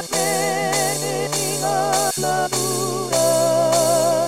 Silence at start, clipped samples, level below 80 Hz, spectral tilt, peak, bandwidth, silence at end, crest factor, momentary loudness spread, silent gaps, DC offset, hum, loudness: 0 s; under 0.1%; -62 dBFS; -3 dB/octave; -6 dBFS; 16.5 kHz; 0 s; 14 dB; 4 LU; none; 0.5%; none; -19 LUFS